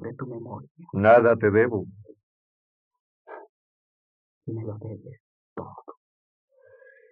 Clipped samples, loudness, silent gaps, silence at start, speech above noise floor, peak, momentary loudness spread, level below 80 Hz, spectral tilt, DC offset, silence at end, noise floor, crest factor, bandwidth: under 0.1%; -22 LUFS; 0.71-0.75 s, 2.23-2.91 s, 3.00-3.25 s, 3.49-4.41 s, 5.20-5.56 s; 0 s; 31 dB; -6 dBFS; 27 LU; -74 dBFS; -7 dB/octave; under 0.1%; 1.2 s; -54 dBFS; 22 dB; 4.6 kHz